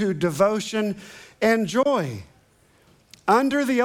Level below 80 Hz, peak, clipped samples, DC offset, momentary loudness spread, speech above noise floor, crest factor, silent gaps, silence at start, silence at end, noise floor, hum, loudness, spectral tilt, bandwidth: -64 dBFS; -4 dBFS; under 0.1%; under 0.1%; 14 LU; 37 dB; 18 dB; none; 0 s; 0 s; -58 dBFS; none; -22 LUFS; -5.5 dB/octave; 18.5 kHz